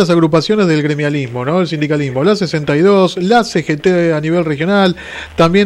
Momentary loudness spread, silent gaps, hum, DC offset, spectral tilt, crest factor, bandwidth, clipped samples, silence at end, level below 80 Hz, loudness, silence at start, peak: 6 LU; none; none; under 0.1%; -6.5 dB/octave; 12 dB; 12 kHz; under 0.1%; 0 s; -44 dBFS; -13 LUFS; 0 s; -2 dBFS